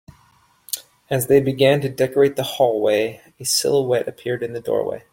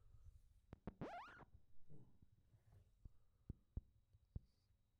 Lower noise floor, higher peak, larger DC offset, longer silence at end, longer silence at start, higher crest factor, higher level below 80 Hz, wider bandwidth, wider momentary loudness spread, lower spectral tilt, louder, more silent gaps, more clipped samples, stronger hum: second, -57 dBFS vs -80 dBFS; first, -2 dBFS vs -36 dBFS; neither; first, 0.15 s vs 0 s; first, 0.7 s vs 0 s; second, 18 dB vs 24 dB; first, -58 dBFS vs -66 dBFS; first, 17 kHz vs 7 kHz; second, 11 LU vs 15 LU; second, -4.5 dB/octave vs -6.5 dB/octave; first, -20 LUFS vs -59 LUFS; neither; neither; neither